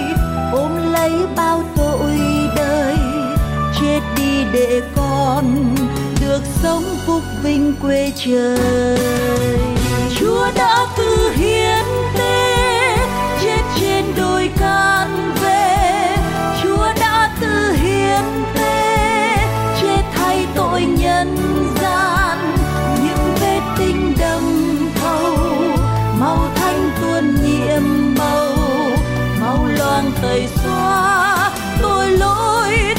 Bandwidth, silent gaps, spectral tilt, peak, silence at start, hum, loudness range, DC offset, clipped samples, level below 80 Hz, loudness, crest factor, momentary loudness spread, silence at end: 16.5 kHz; none; -5 dB/octave; -4 dBFS; 0 s; none; 2 LU; under 0.1%; under 0.1%; -26 dBFS; -16 LUFS; 12 dB; 4 LU; 0 s